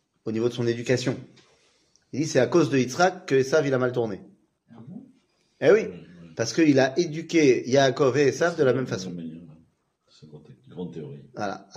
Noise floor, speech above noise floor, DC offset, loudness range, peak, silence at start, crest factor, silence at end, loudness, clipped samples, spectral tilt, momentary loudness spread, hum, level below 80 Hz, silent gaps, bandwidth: -66 dBFS; 43 dB; under 0.1%; 5 LU; -6 dBFS; 0.25 s; 20 dB; 0.2 s; -23 LUFS; under 0.1%; -5.5 dB/octave; 19 LU; none; -68 dBFS; none; 11 kHz